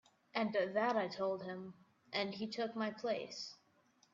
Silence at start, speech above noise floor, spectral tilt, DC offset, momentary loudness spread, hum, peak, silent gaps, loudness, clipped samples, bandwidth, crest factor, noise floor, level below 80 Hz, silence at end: 0.35 s; 34 dB; -3 dB/octave; under 0.1%; 12 LU; none; -22 dBFS; none; -40 LUFS; under 0.1%; 7.6 kHz; 20 dB; -73 dBFS; -84 dBFS; 0.6 s